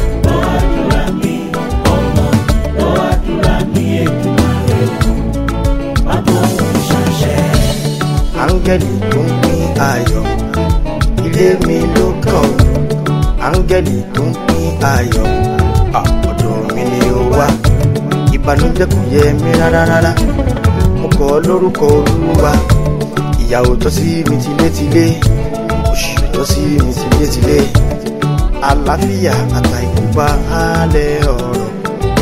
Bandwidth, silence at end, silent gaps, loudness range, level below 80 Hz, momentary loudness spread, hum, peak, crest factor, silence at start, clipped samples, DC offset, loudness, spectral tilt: 16.5 kHz; 0 s; none; 2 LU; -18 dBFS; 5 LU; none; 0 dBFS; 12 dB; 0 s; 0.1%; under 0.1%; -13 LUFS; -6.5 dB/octave